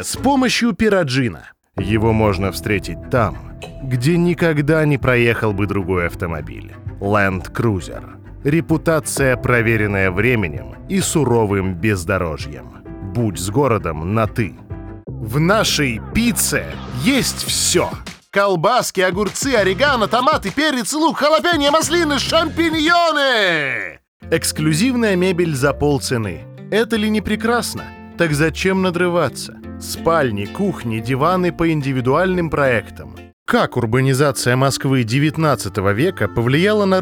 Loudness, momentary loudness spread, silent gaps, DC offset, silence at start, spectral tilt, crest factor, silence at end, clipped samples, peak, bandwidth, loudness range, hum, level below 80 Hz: -17 LUFS; 13 LU; 24.08-24.20 s, 33.33-33.46 s; under 0.1%; 0 s; -5 dB/octave; 16 dB; 0 s; under 0.1%; -2 dBFS; over 20 kHz; 4 LU; none; -38 dBFS